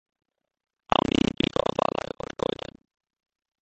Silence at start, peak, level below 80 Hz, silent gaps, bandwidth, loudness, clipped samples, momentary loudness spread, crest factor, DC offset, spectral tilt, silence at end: 0.9 s; -2 dBFS; -48 dBFS; none; 8.8 kHz; -27 LUFS; under 0.1%; 12 LU; 28 dB; under 0.1%; -5.5 dB/octave; 2.7 s